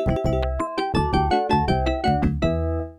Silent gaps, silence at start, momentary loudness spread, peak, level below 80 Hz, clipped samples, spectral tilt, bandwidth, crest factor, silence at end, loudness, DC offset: none; 0 s; 4 LU; -6 dBFS; -30 dBFS; under 0.1%; -7.5 dB/octave; 11 kHz; 16 dB; 0.05 s; -22 LUFS; under 0.1%